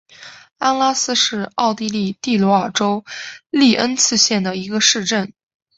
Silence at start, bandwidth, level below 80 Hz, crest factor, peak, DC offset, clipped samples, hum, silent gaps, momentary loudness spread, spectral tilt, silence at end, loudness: 0.2 s; 8.2 kHz; -60 dBFS; 18 dB; 0 dBFS; under 0.1%; under 0.1%; none; none; 8 LU; -2.5 dB/octave; 0.45 s; -16 LUFS